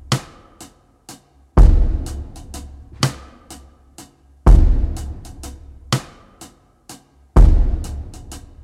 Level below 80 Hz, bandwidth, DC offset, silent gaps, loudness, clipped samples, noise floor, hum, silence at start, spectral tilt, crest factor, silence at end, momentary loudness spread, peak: -18 dBFS; 12.5 kHz; under 0.1%; none; -18 LUFS; under 0.1%; -45 dBFS; none; 0.1 s; -6 dB/octave; 16 dB; 0.25 s; 27 LU; 0 dBFS